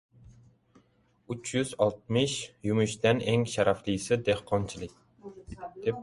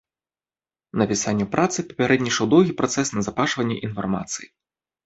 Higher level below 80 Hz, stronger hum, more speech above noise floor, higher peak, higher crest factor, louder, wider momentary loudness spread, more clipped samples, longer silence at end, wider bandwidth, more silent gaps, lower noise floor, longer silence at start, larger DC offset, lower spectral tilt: about the same, -56 dBFS vs -54 dBFS; neither; second, 38 dB vs over 68 dB; second, -10 dBFS vs -2 dBFS; about the same, 20 dB vs 20 dB; second, -29 LUFS vs -22 LUFS; first, 18 LU vs 9 LU; neither; second, 0 s vs 0.6 s; first, 11.5 kHz vs 8.2 kHz; neither; second, -66 dBFS vs under -90 dBFS; second, 0.3 s vs 0.95 s; neither; about the same, -5 dB/octave vs -4.5 dB/octave